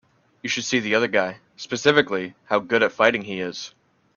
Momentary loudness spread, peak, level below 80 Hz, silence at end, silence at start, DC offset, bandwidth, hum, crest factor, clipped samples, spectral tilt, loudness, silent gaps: 14 LU; 0 dBFS; -64 dBFS; 0.5 s; 0.45 s; under 0.1%; 7.4 kHz; none; 22 dB; under 0.1%; -3.5 dB/octave; -22 LUFS; none